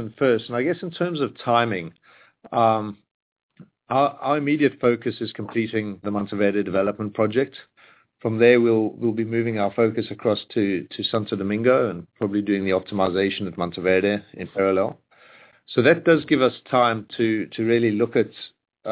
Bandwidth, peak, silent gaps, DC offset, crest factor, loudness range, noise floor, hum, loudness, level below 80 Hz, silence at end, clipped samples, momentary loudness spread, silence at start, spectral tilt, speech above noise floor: 4 kHz; -4 dBFS; 3.11-3.36 s, 3.43-3.49 s; under 0.1%; 18 dB; 3 LU; -55 dBFS; none; -22 LUFS; -58 dBFS; 0 s; under 0.1%; 9 LU; 0 s; -10.5 dB/octave; 34 dB